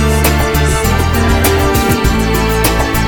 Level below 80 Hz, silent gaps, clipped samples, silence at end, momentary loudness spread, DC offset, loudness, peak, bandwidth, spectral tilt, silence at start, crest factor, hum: -16 dBFS; none; under 0.1%; 0 s; 2 LU; under 0.1%; -12 LUFS; 0 dBFS; over 20 kHz; -5 dB/octave; 0 s; 12 dB; none